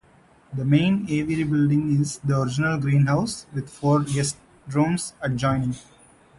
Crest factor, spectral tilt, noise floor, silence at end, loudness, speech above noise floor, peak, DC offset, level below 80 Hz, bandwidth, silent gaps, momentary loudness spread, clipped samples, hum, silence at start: 16 dB; -6.5 dB/octave; -55 dBFS; 0.6 s; -23 LUFS; 33 dB; -8 dBFS; under 0.1%; -52 dBFS; 11.5 kHz; none; 9 LU; under 0.1%; none; 0.5 s